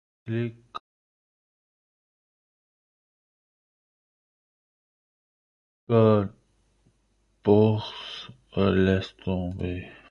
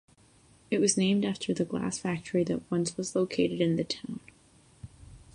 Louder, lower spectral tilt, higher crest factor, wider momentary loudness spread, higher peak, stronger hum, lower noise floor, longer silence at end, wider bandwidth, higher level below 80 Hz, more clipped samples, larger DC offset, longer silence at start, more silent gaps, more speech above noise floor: first, -25 LUFS vs -29 LUFS; first, -8.5 dB/octave vs -5 dB/octave; first, 24 dB vs 18 dB; first, 17 LU vs 11 LU; first, -6 dBFS vs -12 dBFS; neither; first, -68 dBFS vs -60 dBFS; about the same, 0.2 s vs 0.2 s; second, 7 kHz vs 11 kHz; first, -50 dBFS vs -62 dBFS; neither; neither; second, 0.25 s vs 0.7 s; first, 0.80-5.87 s vs none; first, 45 dB vs 31 dB